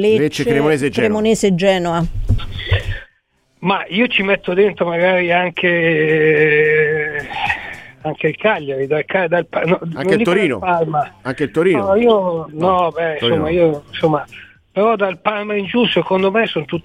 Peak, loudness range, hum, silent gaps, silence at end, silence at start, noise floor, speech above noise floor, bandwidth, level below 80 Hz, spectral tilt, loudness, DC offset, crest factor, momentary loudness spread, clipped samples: -2 dBFS; 4 LU; none; none; 0.05 s; 0 s; -60 dBFS; 45 dB; 13 kHz; -34 dBFS; -6 dB/octave; -16 LUFS; under 0.1%; 14 dB; 8 LU; under 0.1%